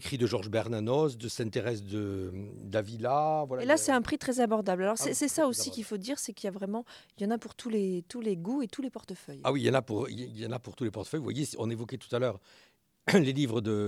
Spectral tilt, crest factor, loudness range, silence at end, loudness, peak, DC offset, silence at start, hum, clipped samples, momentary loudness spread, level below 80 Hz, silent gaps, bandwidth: -5 dB/octave; 20 dB; 6 LU; 0 s; -31 LUFS; -10 dBFS; under 0.1%; 0 s; none; under 0.1%; 11 LU; -66 dBFS; none; 16 kHz